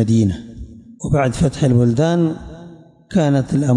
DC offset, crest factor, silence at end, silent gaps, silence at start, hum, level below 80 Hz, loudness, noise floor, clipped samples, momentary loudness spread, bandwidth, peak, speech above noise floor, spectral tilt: under 0.1%; 12 dB; 0 s; none; 0 s; none; -38 dBFS; -17 LUFS; -40 dBFS; under 0.1%; 21 LU; 11.5 kHz; -6 dBFS; 25 dB; -7.5 dB/octave